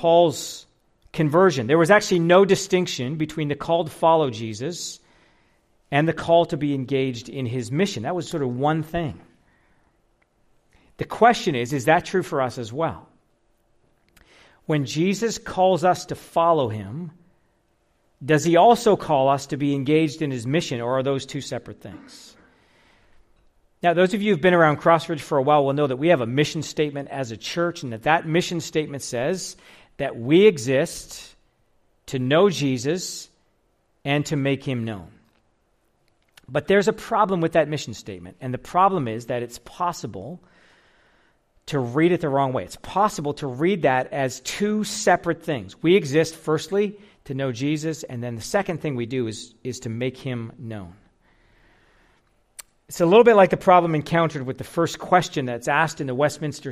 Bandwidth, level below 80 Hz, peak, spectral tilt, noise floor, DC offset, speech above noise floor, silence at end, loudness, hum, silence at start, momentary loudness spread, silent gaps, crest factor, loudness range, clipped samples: 15 kHz; -56 dBFS; -4 dBFS; -5.5 dB/octave; -66 dBFS; under 0.1%; 45 dB; 0 s; -22 LUFS; none; 0 s; 16 LU; none; 20 dB; 8 LU; under 0.1%